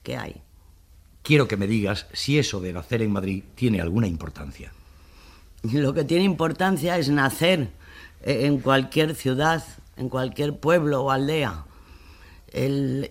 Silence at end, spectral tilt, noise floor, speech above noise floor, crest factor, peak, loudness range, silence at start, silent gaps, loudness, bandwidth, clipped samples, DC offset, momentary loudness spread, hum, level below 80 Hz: 0 s; -6 dB/octave; -52 dBFS; 29 dB; 20 dB; -4 dBFS; 4 LU; 0.05 s; none; -23 LUFS; 16 kHz; under 0.1%; under 0.1%; 14 LU; none; -46 dBFS